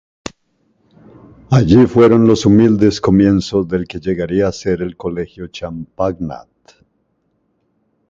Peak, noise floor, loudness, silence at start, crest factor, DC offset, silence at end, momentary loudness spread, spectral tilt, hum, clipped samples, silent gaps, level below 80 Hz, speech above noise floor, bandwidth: 0 dBFS; -64 dBFS; -13 LUFS; 1.5 s; 16 dB; under 0.1%; 1.7 s; 18 LU; -7.5 dB/octave; none; under 0.1%; none; -38 dBFS; 51 dB; 7.8 kHz